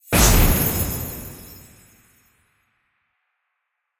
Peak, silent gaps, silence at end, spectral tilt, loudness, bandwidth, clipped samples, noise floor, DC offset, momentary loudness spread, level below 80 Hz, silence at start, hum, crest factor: -2 dBFS; none; 2.45 s; -3.5 dB/octave; -18 LUFS; 16.5 kHz; under 0.1%; -77 dBFS; under 0.1%; 24 LU; -28 dBFS; 0.1 s; none; 20 dB